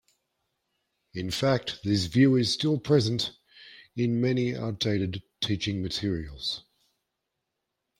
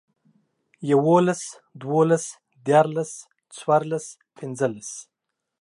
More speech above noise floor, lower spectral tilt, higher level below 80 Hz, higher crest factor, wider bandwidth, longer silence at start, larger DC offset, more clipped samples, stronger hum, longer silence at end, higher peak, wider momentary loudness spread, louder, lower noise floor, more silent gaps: about the same, 57 dB vs 60 dB; about the same, -6 dB/octave vs -6 dB/octave; first, -56 dBFS vs -74 dBFS; about the same, 20 dB vs 20 dB; first, 16 kHz vs 11.5 kHz; first, 1.15 s vs 0.8 s; neither; neither; neither; first, 1.4 s vs 0.6 s; second, -10 dBFS vs -4 dBFS; second, 11 LU vs 19 LU; second, -27 LUFS vs -22 LUFS; about the same, -83 dBFS vs -82 dBFS; neither